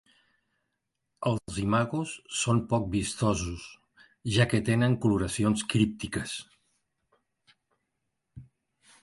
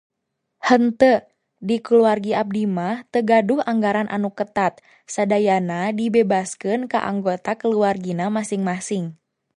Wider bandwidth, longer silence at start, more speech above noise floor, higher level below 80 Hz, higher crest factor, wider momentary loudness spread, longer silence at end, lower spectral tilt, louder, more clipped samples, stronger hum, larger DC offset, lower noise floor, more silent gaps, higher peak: about the same, 11.5 kHz vs 11 kHz; first, 1.2 s vs 0.6 s; second, 54 dB vs 58 dB; first, -50 dBFS vs -62 dBFS; about the same, 22 dB vs 18 dB; first, 11 LU vs 8 LU; first, 0.6 s vs 0.45 s; about the same, -5.5 dB/octave vs -6 dB/octave; second, -28 LUFS vs -20 LUFS; neither; neither; neither; first, -82 dBFS vs -77 dBFS; neither; second, -8 dBFS vs -2 dBFS